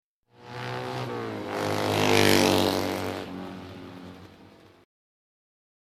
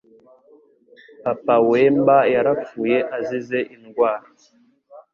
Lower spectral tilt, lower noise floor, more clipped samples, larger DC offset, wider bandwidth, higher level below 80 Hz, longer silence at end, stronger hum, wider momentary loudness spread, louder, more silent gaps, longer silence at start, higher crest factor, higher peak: second, -4 dB/octave vs -7.5 dB/octave; about the same, -53 dBFS vs -53 dBFS; neither; neither; first, 16 kHz vs 7 kHz; about the same, -62 dBFS vs -64 dBFS; first, 1.55 s vs 0.15 s; neither; first, 23 LU vs 11 LU; second, -25 LUFS vs -19 LUFS; neither; second, 0.4 s vs 1.25 s; first, 26 dB vs 16 dB; about the same, -4 dBFS vs -4 dBFS